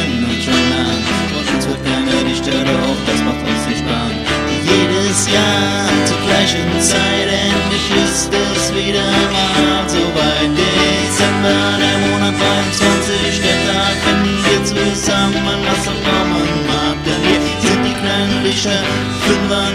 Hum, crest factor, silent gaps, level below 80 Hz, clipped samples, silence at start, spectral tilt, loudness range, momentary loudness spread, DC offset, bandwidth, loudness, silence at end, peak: none; 14 dB; none; -32 dBFS; under 0.1%; 0 s; -3.5 dB/octave; 2 LU; 4 LU; under 0.1%; 15 kHz; -14 LUFS; 0 s; 0 dBFS